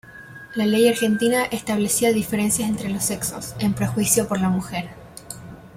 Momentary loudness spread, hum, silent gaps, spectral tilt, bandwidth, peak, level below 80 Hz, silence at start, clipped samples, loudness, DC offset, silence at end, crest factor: 19 LU; none; none; -4 dB/octave; 16.5 kHz; -4 dBFS; -50 dBFS; 0.05 s; under 0.1%; -21 LUFS; under 0.1%; 0 s; 18 dB